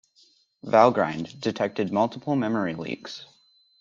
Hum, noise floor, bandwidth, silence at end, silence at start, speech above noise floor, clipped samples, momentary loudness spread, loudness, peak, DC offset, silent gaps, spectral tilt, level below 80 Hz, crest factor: none; -61 dBFS; 7.6 kHz; 0.55 s; 0.65 s; 37 dB; under 0.1%; 17 LU; -25 LUFS; -2 dBFS; under 0.1%; none; -6.5 dB/octave; -66 dBFS; 22 dB